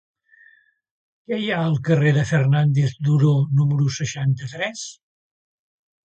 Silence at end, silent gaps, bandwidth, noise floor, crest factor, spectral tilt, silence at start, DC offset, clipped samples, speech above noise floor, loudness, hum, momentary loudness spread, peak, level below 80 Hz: 1.15 s; none; 8.4 kHz; -56 dBFS; 14 dB; -6.5 dB/octave; 1.3 s; under 0.1%; under 0.1%; 37 dB; -20 LUFS; none; 10 LU; -6 dBFS; -56 dBFS